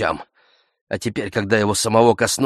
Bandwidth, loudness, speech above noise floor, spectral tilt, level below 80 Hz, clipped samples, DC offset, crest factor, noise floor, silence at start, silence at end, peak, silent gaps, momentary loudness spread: 15 kHz; -18 LUFS; 41 dB; -4 dB/octave; -52 dBFS; under 0.1%; under 0.1%; 18 dB; -60 dBFS; 0 s; 0 s; 0 dBFS; 0.81-0.87 s; 13 LU